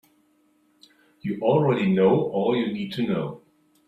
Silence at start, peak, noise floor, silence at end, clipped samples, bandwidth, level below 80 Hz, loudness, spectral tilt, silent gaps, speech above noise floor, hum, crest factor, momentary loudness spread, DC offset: 1.25 s; -8 dBFS; -64 dBFS; 0.5 s; under 0.1%; 7.6 kHz; -62 dBFS; -23 LUFS; -8.5 dB/octave; none; 42 dB; none; 18 dB; 12 LU; under 0.1%